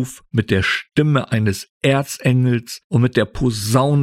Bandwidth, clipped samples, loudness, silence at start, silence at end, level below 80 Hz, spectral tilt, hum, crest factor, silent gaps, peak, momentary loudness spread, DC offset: 15.5 kHz; under 0.1%; -18 LUFS; 0 s; 0 s; -42 dBFS; -6 dB/octave; none; 16 dB; 1.70-1.81 s, 2.84-2.90 s; -2 dBFS; 5 LU; under 0.1%